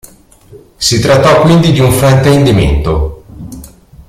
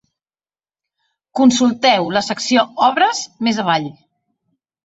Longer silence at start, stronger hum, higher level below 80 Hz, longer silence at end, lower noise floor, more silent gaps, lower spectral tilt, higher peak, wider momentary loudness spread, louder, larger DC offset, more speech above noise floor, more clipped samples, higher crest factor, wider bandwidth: second, 0.5 s vs 1.35 s; neither; first, -22 dBFS vs -62 dBFS; second, 0.4 s vs 0.95 s; second, -33 dBFS vs under -90 dBFS; neither; first, -5.5 dB/octave vs -3.5 dB/octave; about the same, 0 dBFS vs -2 dBFS; first, 22 LU vs 7 LU; first, -8 LUFS vs -16 LUFS; neither; second, 26 dB vs over 75 dB; neither; second, 10 dB vs 16 dB; first, 16 kHz vs 8 kHz